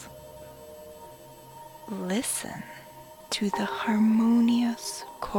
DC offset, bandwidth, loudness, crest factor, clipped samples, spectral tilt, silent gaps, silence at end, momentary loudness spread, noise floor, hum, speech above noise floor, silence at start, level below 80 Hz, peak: under 0.1%; 19 kHz; -26 LUFS; 14 dB; under 0.1%; -4.5 dB/octave; none; 0 s; 24 LU; -48 dBFS; none; 22 dB; 0 s; -60 dBFS; -14 dBFS